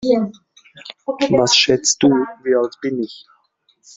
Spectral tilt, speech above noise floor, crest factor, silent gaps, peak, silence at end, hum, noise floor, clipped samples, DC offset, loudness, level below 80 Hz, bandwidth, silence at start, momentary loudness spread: -3 dB/octave; 44 dB; 18 dB; none; 0 dBFS; 0.8 s; none; -61 dBFS; under 0.1%; under 0.1%; -16 LUFS; -56 dBFS; 8.2 kHz; 0 s; 17 LU